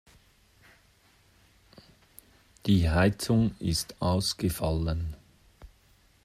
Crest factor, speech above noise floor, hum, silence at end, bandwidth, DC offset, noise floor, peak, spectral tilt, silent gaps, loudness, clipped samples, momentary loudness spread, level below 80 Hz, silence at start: 20 dB; 36 dB; none; 0.6 s; 15 kHz; under 0.1%; -63 dBFS; -10 dBFS; -5.5 dB/octave; none; -28 LUFS; under 0.1%; 11 LU; -44 dBFS; 2.65 s